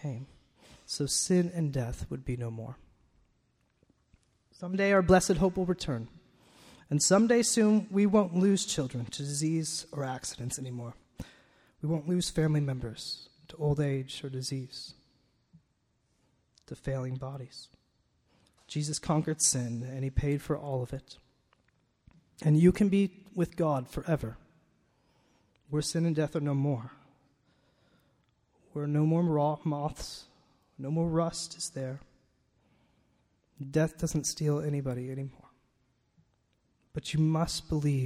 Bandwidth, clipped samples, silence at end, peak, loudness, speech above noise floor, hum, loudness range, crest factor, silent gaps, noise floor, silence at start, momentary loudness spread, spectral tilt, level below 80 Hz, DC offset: 15 kHz; under 0.1%; 0 s; -8 dBFS; -30 LUFS; 45 dB; none; 10 LU; 22 dB; none; -74 dBFS; 0 s; 18 LU; -5.5 dB/octave; -52 dBFS; under 0.1%